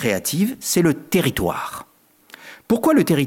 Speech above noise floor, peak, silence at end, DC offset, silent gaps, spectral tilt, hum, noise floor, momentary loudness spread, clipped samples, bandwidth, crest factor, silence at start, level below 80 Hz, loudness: 29 dB; -6 dBFS; 0 s; under 0.1%; none; -5 dB/octave; none; -48 dBFS; 18 LU; under 0.1%; 17 kHz; 14 dB; 0 s; -50 dBFS; -20 LUFS